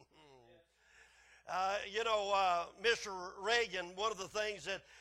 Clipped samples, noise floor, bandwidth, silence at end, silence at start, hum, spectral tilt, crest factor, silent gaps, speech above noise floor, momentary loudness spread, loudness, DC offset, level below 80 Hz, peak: under 0.1%; -67 dBFS; 14 kHz; 0 s; 0.3 s; none; -1.5 dB/octave; 20 dB; none; 30 dB; 9 LU; -37 LUFS; under 0.1%; -70 dBFS; -18 dBFS